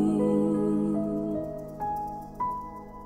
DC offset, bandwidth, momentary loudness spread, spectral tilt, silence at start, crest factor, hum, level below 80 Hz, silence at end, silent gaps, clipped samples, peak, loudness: under 0.1%; 15 kHz; 12 LU; -9.5 dB/octave; 0 s; 14 dB; none; -52 dBFS; 0 s; none; under 0.1%; -14 dBFS; -29 LUFS